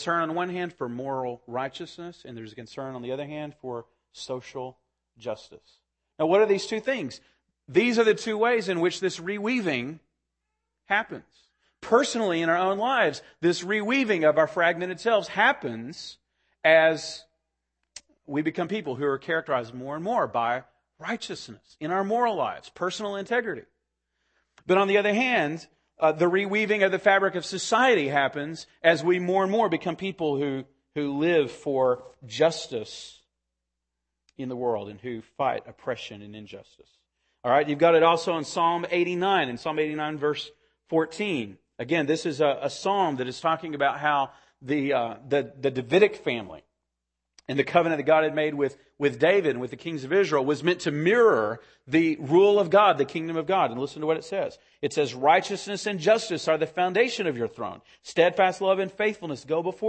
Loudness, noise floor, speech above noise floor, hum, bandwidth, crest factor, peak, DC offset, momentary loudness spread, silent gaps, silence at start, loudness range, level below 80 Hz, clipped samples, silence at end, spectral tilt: -25 LUFS; -84 dBFS; 58 dB; none; 8.8 kHz; 20 dB; -4 dBFS; under 0.1%; 16 LU; none; 0 s; 8 LU; -70 dBFS; under 0.1%; 0 s; -5 dB/octave